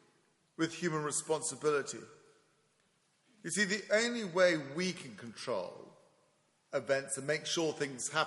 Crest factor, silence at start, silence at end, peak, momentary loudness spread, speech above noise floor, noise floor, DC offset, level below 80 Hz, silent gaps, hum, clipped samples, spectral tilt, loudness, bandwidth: 22 dB; 0.6 s; 0 s; -14 dBFS; 16 LU; 39 dB; -74 dBFS; under 0.1%; -82 dBFS; none; none; under 0.1%; -3 dB/octave; -34 LUFS; 11.5 kHz